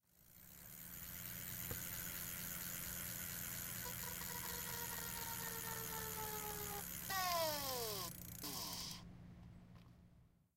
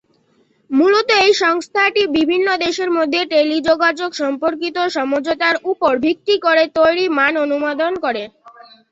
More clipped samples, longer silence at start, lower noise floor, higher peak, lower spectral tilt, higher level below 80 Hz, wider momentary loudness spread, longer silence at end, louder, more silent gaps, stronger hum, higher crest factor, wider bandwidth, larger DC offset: neither; second, 0.15 s vs 0.7 s; first, -69 dBFS vs -58 dBFS; second, -26 dBFS vs -2 dBFS; about the same, -2 dB/octave vs -3 dB/octave; second, -64 dBFS vs -58 dBFS; first, 18 LU vs 7 LU; about the same, 0.3 s vs 0.4 s; second, -44 LUFS vs -16 LUFS; neither; neither; first, 22 dB vs 14 dB; first, 17 kHz vs 8 kHz; neither